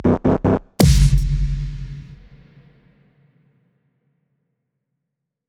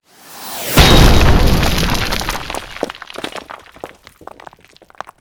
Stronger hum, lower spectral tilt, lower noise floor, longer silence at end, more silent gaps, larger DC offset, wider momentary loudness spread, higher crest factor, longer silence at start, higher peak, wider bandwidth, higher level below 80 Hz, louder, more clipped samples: neither; first, -6.5 dB/octave vs -4.5 dB/octave; first, -80 dBFS vs -46 dBFS; first, 3.35 s vs 1.35 s; neither; neither; second, 19 LU vs 25 LU; first, 20 dB vs 14 dB; second, 0 s vs 0.3 s; about the same, 0 dBFS vs 0 dBFS; about the same, 19 kHz vs over 20 kHz; second, -24 dBFS vs -18 dBFS; second, -18 LUFS vs -13 LUFS; second, under 0.1% vs 0.3%